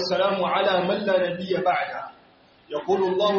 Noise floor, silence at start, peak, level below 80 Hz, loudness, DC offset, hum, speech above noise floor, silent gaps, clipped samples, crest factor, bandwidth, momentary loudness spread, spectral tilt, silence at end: -55 dBFS; 0 s; -8 dBFS; -68 dBFS; -23 LUFS; under 0.1%; none; 32 dB; none; under 0.1%; 14 dB; 6.8 kHz; 11 LU; -3 dB/octave; 0 s